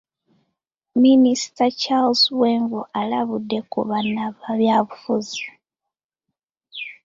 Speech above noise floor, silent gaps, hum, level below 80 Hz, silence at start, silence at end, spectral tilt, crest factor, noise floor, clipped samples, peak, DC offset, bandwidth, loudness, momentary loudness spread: 66 dB; 6.04-6.09 s, 6.43-6.48 s; none; -66 dBFS; 0.95 s; 0.15 s; -4.5 dB/octave; 16 dB; -86 dBFS; under 0.1%; -6 dBFS; under 0.1%; 7.6 kHz; -20 LUFS; 14 LU